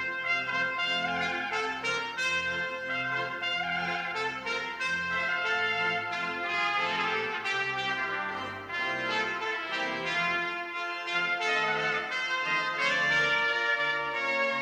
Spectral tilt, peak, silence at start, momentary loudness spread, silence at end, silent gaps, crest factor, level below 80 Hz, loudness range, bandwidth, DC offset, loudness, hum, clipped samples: -2.5 dB/octave; -14 dBFS; 0 s; 5 LU; 0 s; none; 16 dB; -68 dBFS; 3 LU; 16 kHz; under 0.1%; -29 LUFS; none; under 0.1%